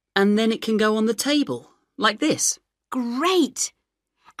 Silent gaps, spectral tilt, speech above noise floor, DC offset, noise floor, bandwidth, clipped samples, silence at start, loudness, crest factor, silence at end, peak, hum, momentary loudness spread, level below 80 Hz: none; -3 dB/octave; 52 dB; under 0.1%; -73 dBFS; 15.5 kHz; under 0.1%; 0.15 s; -22 LUFS; 20 dB; 0.7 s; -4 dBFS; none; 9 LU; -70 dBFS